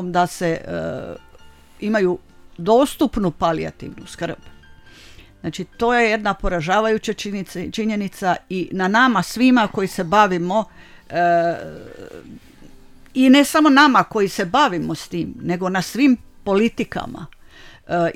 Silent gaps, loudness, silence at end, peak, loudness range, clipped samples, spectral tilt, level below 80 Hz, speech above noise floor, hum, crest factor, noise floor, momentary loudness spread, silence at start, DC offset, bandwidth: none; -19 LUFS; 0 s; 0 dBFS; 6 LU; under 0.1%; -5 dB/octave; -42 dBFS; 26 dB; none; 20 dB; -45 dBFS; 17 LU; 0 s; under 0.1%; 16 kHz